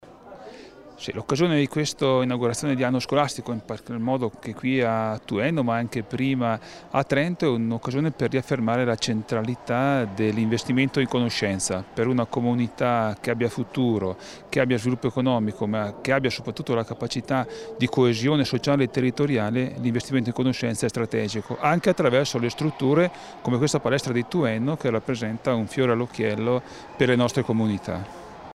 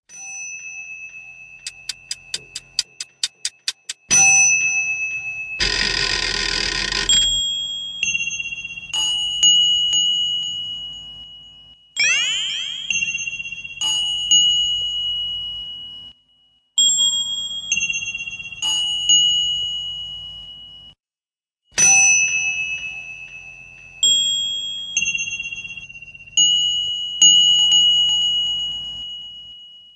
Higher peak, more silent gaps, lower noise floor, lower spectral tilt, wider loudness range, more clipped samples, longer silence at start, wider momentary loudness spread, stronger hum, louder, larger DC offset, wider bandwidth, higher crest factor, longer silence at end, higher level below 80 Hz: second, -6 dBFS vs -2 dBFS; neither; second, -45 dBFS vs under -90 dBFS; first, -6 dB/octave vs 2 dB/octave; second, 2 LU vs 6 LU; neither; about the same, 0.05 s vs 0.1 s; second, 8 LU vs 21 LU; neither; second, -24 LUFS vs -16 LUFS; neither; first, 13 kHz vs 11 kHz; about the same, 18 dB vs 18 dB; about the same, 0.05 s vs 0.15 s; second, -56 dBFS vs -46 dBFS